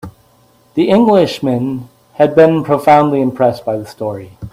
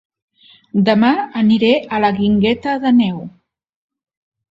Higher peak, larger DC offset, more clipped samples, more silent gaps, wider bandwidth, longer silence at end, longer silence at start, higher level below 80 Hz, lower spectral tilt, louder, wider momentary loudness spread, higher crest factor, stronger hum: about the same, 0 dBFS vs 0 dBFS; neither; neither; neither; first, 15.5 kHz vs 7.4 kHz; second, 0.05 s vs 1.2 s; second, 0.05 s vs 0.75 s; about the same, -50 dBFS vs -52 dBFS; about the same, -7.5 dB/octave vs -8 dB/octave; about the same, -13 LUFS vs -15 LUFS; first, 14 LU vs 8 LU; about the same, 14 dB vs 16 dB; neither